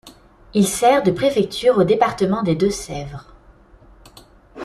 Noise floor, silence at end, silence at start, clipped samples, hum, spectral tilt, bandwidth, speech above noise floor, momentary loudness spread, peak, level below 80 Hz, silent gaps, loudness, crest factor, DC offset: -48 dBFS; 0 s; 0.05 s; under 0.1%; none; -5 dB/octave; 14 kHz; 31 dB; 14 LU; -2 dBFS; -46 dBFS; none; -18 LUFS; 18 dB; under 0.1%